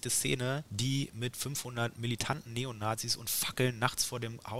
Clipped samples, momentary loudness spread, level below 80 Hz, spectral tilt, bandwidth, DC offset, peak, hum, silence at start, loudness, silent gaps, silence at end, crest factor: under 0.1%; 6 LU; -62 dBFS; -3.5 dB/octave; 16 kHz; 0.1%; -10 dBFS; none; 0 s; -34 LUFS; none; 0 s; 24 dB